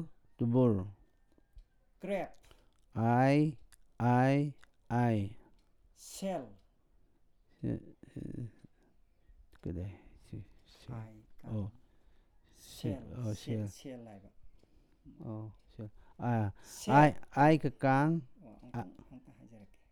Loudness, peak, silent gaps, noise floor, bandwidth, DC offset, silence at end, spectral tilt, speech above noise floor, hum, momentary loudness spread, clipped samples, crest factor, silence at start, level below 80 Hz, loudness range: -33 LUFS; -12 dBFS; none; -67 dBFS; 15 kHz; under 0.1%; 0.25 s; -7.5 dB/octave; 35 dB; none; 23 LU; under 0.1%; 24 dB; 0 s; -62 dBFS; 16 LU